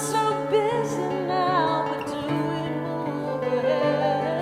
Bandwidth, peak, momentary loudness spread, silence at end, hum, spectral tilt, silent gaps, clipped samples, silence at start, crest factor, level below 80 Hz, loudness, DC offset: 16 kHz; -10 dBFS; 6 LU; 0 s; none; -5.5 dB/octave; none; under 0.1%; 0 s; 14 dB; -62 dBFS; -25 LUFS; under 0.1%